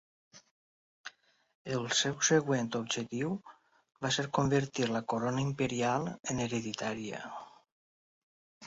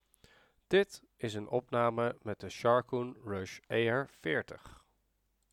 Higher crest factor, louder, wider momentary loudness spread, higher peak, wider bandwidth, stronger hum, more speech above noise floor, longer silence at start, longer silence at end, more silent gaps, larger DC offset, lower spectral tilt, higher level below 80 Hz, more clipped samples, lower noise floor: about the same, 22 dB vs 20 dB; about the same, -32 LUFS vs -34 LUFS; first, 17 LU vs 12 LU; about the same, -12 dBFS vs -14 dBFS; second, 7.6 kHz vs 14.5 kHz; neither; second, 21 dB vs 44 dB; second, 0.35 s vs 0.7 s; second, 0 s vs 0.8 s; first, 0.51-1.04 s, 1.55-1.65 s, 7.72-8.61 s vs none; neither; second, -4 dB/octave vs -6 dB/octave; about the same, -66 dBFS vs -70 dBFS; neither; second, -53 dBFS vs -77 dBFS